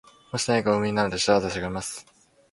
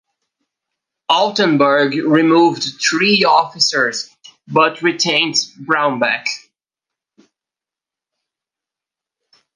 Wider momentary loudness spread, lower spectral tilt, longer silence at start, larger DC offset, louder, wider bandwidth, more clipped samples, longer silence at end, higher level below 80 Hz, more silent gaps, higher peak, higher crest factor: first, 12 LU vs 8 LU; about the same, -4 dB/octave vs -3.5 dB/octave; second, 0.35 s vs 1.1 s; neither; second, -25 LUFS vs -14 LUFS; first, 11.5 kHz vs 10 kHz; neither; second, 0.5 s vs 3.15 s; first, -52 dBFS vs -70 dBFS; neither; second, -6 dBFS vs 0 dBFS; about the same, 20 dB vs 18 dB